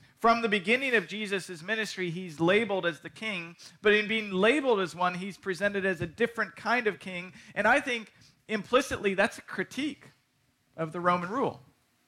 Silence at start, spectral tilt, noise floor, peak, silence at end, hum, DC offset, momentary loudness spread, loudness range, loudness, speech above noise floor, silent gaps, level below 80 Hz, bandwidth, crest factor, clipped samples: 0.2 s; -4.5 dB/octave; -71 dBFS; -10 dBFS; 0.5 s; none; under 0.1%; 11 LU; 3 LU; -29 LUFS; 42 dB; none; -64 dBFS; 15.5 kHz; 18 dB; under 0.1%